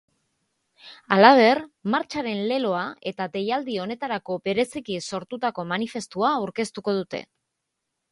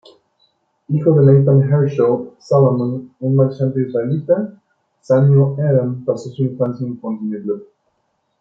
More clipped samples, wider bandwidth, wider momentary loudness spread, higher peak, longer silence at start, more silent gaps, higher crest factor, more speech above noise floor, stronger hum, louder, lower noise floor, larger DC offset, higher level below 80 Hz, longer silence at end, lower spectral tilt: neither; first, 11.5 kHz vs 6.8 kHz; about the same, 14 LU vs 12 LU; about the same, 0 dBFS vs -2 dBFS; about the same, 0.85 s vs 0.9 s; neither; first, 24 dB vs 14 dB; first, 57 dB vs 52 dB; neither; second, -23 LUFS vs -16 LUFS; first, -81 dBFS vs -67 dBFS; neither; second, -68 dBFS vs -60 dBFS; first, 0.9 s vs 0.75 s; second, -5 dB/octave vs -10.5 dB/octave